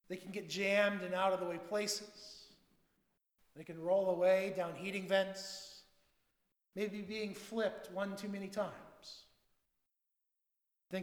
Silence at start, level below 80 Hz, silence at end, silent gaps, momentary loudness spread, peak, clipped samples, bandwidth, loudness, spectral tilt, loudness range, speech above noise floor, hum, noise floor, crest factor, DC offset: 0.1 s; -80 dBFS; 0 s; none; 21 LU; -18 dBFS; under 0.1%; 19 kHz; -37 LUFS; -4 dB/octave; 6 LU; 50 dB; none; -87 dBFS; 22 dB; under 0.1%